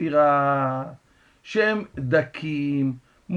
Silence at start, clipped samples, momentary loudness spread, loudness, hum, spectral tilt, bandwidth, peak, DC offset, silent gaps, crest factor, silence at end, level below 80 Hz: 0 s; under 0.1%; 11 LU; -23 LUFS; none; -7.5 dB/octave; 8.2 kHz; -6 dBFS; under 0.1%; none; 18 dB; 0 s; -60 dBFS